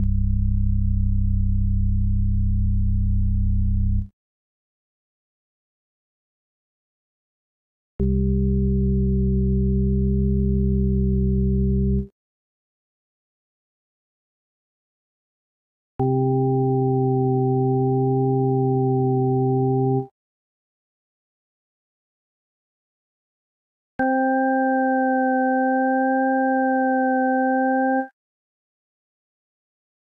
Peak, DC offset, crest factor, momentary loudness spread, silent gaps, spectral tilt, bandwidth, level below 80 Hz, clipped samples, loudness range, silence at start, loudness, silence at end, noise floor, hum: -10 dBFS; under 0.1%; 12 dB; 3 LU; 4.13-7.99 s, 12.12-15.99 s, 20.11-23.99 s; -13.5 dB/octave; 1.8 kHz; -28 dBFS; under 0.1%; 9 LU; 0 s; -21 LUFS; 2.05 s; under -90 dBFS; none